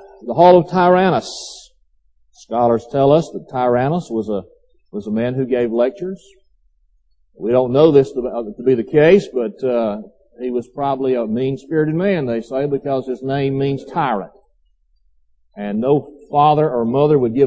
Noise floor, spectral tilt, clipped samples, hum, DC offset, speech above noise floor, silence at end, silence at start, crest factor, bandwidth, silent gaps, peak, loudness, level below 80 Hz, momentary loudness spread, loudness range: -58 dBFS; -7.5 dB/octave; under 0.1%; none; under 0.1%; 42 dB; 0 s; 0.05 s; 18 dB; 8 kHz; none; 0 dBFS; -17 LUFS; -54 dBFS; 14 LU; 6 LU